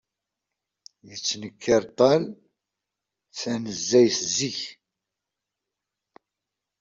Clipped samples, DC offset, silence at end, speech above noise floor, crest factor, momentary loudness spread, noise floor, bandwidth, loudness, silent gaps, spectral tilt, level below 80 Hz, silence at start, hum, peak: under 0.1%; under 0.1%; 2.05 s; 63 dB; 22 dB; 17 LU; -86 dBFS; 7.8 kHz; -23 LUFS; none; -3.5 dB/octave; -66 dBFS; 1.05 s; none; -6 dBFS